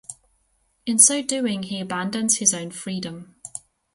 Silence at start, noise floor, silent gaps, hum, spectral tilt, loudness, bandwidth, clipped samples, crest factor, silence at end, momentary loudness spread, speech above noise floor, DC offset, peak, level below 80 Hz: 0.1 s; -67 dBFS; none; none; -2.5 dB/octave; -20 LUFS; 12 kHz; under 0.1%; 24 dB; 0.35 s; 22 LU; 45 dB; under 0.1%; 0 dBFS; -66 dBFS